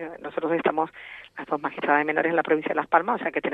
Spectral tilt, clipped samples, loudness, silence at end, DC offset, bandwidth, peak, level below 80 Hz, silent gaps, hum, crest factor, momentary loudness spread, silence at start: -7.5 dB/octave; under 0.1%; -25 LUFS; 0 s; under 0.1%; 4.9 kHz; -4 dBFS; -68 dBFS; none; none; 20 dB; 11 LU; 0 s